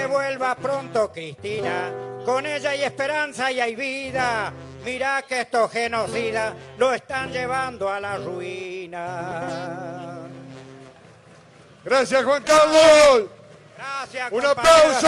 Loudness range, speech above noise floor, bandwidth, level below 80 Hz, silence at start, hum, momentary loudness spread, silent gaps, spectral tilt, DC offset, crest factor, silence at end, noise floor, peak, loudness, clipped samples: 13 LU; 28 dB; 14 kHz; -54 dBFS; 0 s; none; 18 LU; none; -3 dB/octave; under 0.1%; 18 dB; 0 s; -49 dBFS; -2 dBFS; -21 LUFS; under 0.1%